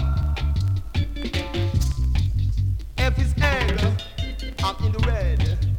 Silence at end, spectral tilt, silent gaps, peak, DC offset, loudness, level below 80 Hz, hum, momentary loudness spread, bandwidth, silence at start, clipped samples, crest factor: 0 s; -6 dB/octave; none; -6 dBFS; under 0.1%; -24 LUFS; -26 dBFS; none; 6 LU; 16 kHz; 0 s; under 0.1%; 16 dB